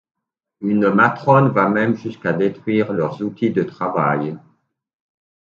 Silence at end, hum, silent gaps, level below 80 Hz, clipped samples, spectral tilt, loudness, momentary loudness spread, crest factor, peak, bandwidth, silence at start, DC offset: 1.1 s; none; none; -62 dBFS; under 0.1%; -9 dB/octave; -18 LUFS; 9 LU; 18 dB; 0 dBFS; 7 kHz; 0.6 s; under 0.1%